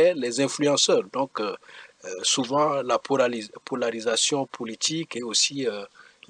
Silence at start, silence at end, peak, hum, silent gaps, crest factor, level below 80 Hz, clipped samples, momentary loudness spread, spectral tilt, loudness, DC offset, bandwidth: 0 s; 0.3 s; -10 dBFS; none; none; 16 dB; -76 dBFS; under 0.1%; 12 LU; -2.5 dB/octave; -24 LUFS; under 0.1%; 10.5 kHz